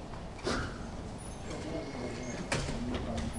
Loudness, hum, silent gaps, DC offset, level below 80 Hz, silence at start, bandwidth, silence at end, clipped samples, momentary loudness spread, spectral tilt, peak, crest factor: -38 LUFS; none; none; under 0.1%; -46 dBFS; 0 s; 11.5 kHz; 0 s; under 0.1%; 8 LU; -5 dB/octave; -18 dBFS; 18 dB